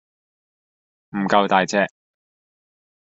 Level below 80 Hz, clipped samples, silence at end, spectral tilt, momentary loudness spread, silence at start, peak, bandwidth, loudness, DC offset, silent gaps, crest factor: -64 dBFS; under 0.1%; 1.2 s; -3 dB/octave; 10 LU; 1.15 s; -2 dBFS; 8 kHz; -19 LUFS; under 0.1%; none; 22 dB